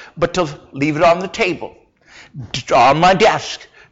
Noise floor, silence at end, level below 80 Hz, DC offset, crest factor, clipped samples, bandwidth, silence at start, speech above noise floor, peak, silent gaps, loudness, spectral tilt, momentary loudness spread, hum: -45 dBFS; 0.3 s; -44 dBFS; under 0.1%; 12 dB; under 0.1%; 8 kHz; 0 s; 29 dB; -4 dBFS; none; -15 LUFS; -4.5 dB/octave; 17 LU; none